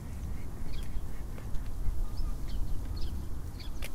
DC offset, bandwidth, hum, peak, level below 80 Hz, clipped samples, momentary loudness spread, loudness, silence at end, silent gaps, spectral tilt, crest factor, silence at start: under 0.1%; 15 kHz; none; -16 dBFS; -36 dBFS; under 0.1%; 3 LU; -41 LUFS; 0 s; none; -6 dB/octave; 14 dB; 0 s